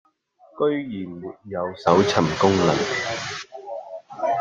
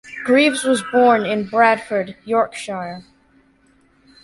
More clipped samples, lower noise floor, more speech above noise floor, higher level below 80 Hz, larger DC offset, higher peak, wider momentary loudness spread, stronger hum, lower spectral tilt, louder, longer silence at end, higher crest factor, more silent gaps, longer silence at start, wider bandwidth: neither; about the same, -56 dBFS vs -56 dBFS; second, 34 dB vs 39 dB; first, -56 dBFS vs -62 dBFS; neither; about the same, -2 dBFS vs -2 dBFS; first, 17 LU vs 13 LU; neither; about the same, -5 dB/octave vs -4 dB/octave; second, -22 LUFS vs -17 LUFS; second, 0 s vs 1.25 s; first, 22 dB vs 16 dB; neither; first, 0.55 s vs 0.05 s; second, 9.4 kHz vs 11.5 kHz